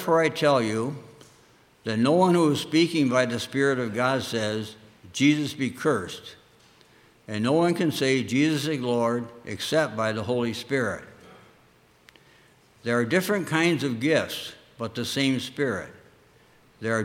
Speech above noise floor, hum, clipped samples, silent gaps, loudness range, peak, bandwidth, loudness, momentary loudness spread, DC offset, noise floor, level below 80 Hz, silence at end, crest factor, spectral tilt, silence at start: 34 dB; none; under 0.1%; none; 5 LU; -6 dBFS; 16.5 kHz; -25 LUFS; 13 LU; under 0.1%; -59 dBFS; -66 dBFS; 0 s; 20 dB; -5 dB/octave; 0 s